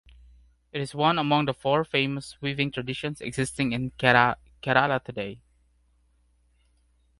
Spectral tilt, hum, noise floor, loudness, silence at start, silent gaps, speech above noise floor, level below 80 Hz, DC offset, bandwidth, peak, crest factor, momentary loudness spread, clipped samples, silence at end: -5 dB/octave; none; -65 dBFS; -25 LUFS; 0.75 s; none; 40 dB; -56 dBFS; under 0.1%; 11.5 kHz; -4 dBFS; 24 dB; 13 LU; under 0.1%; 1.85 s